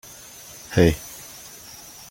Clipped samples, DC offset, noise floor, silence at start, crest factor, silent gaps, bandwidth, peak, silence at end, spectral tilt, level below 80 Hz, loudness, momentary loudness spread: under 0.1%; under 0.1%; -43 dBFS; 0.7 s; 24 dB; none; 17 kHz; -2 dBFS; 0.95 s; -5.5 dB/octave; -42 dBFS; -21 LUFS; 21 LU